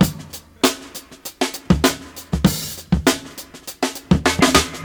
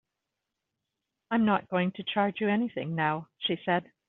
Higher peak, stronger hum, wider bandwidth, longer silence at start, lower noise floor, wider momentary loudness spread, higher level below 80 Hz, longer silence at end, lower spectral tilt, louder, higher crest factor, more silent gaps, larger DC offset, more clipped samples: first, 0 dBFS vs -12 dBFS; neither; first, over 20 kHz vs 4.1 kHz; second, 0 s vs 1.3 s; second, -38 dBFS vs -86 dBFS; first, 19 LU vs 6 LU; first, -34 dBFS vs -72 dBFS; second, 0 s vs 0.25 s; about the same, -4 dB/octave vs -4 dB/octave; first, -19 LUFS vs -29 LUFS; about the same, 20 dB vs 18 dB; neither; neither; neither